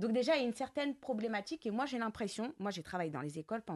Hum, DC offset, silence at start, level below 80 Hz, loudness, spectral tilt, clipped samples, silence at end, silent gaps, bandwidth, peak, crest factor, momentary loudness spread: none; under 0.1%; 0 s; -72 dBFS; -38 LUFS; -5 dB/octave; under 0.1%; 0 s; none; 12 kHz; -22 dBFS; 16 dB; 8 LU